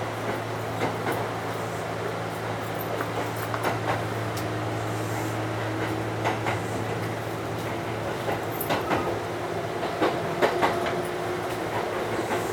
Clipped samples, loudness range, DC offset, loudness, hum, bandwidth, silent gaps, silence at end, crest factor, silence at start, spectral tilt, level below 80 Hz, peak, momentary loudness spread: under 0.1%; 2 LU; under 0.1%; -28 LUFS; none; 19.5 kHz; none; 0 s; 20 dB; 0 s; -5.5 dB/octave; -54 dBFS; -8 dBFS; 5 LU